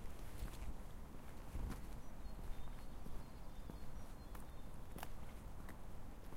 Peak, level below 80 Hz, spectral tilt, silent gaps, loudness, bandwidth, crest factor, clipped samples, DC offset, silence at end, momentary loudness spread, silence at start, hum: -30 dBFS; -52 dBFS; -5.5 dB/octave; none; -55 LUFS; 16 kHz; 16 dB; under 0.1%; under 0.1%; 0 s; 6 LU; 0 s; none